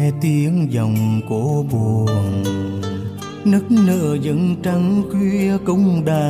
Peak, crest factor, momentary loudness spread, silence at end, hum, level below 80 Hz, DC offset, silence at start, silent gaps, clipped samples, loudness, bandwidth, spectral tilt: -6 dBFS; 12 dB; 7 LU; 0 s; none; -50 dBFS; under 0.1%; 0 s; none; under 0.1%; -18 LUFS; 15.5 kHz; -8 dB/octave